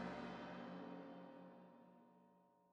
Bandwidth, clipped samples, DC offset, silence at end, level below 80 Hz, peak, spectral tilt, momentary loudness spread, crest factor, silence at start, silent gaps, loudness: 8.8 kHz; under 0.1%; under 0.1%; 0 s; -82 dBFS; -36 dBFS; -7 dB/octave; 16 LU; 18 dB; 0 s; none; -54 LUFS